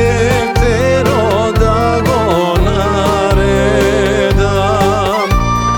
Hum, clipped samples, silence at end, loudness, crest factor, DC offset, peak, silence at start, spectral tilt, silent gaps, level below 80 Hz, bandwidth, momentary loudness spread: none; under 0.1%; 0 s; -12 LUFS; 10 dB; under 0.1%; 0 dBFS; 0 s; -6 dB/octave; none; -20 dBFS; 19 kHz; 2 LU